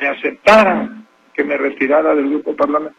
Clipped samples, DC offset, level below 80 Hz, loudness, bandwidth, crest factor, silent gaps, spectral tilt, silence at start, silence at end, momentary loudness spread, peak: under 0.1%; under 0.1%; -52 dBFS; -14 LUFS; 11.5 kHz; 16 dB; none; -5 dB/octave; 0 s; 0.1 s; 12 LU; 0 dBFS